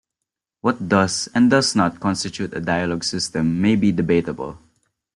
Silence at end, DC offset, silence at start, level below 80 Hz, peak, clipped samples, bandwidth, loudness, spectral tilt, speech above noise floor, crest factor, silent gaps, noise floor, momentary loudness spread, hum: 0.6 s; under 0.1%; 0.65 s; -52 dBFS; -4 dBFS; under 0.1%; 11.5 kHz; -20 LUFS; -5 dB/octave; 64 dB; 18 dB; none; -83 dBFS; 10 LU; none